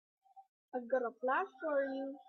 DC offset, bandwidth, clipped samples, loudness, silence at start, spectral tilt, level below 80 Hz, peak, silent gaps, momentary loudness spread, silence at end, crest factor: under 0.1%; 6.4 kHz; under 0.1%; -37 LUFS; 0.35 s; -6 dB/octave; -88 dBFS; -22 dBFS; 0.49-0.68 s; 8 LU; 0.05 s; 16 dB